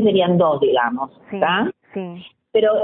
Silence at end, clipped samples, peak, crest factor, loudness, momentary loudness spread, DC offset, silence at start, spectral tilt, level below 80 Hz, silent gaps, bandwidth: 0 s; under 0.1%; -4 dBFS; 14 dB; -18 LUFS; 15 LU; under 0.1%; 0 s; -11 dB/octave; -60 dBFS; none; 4 kHz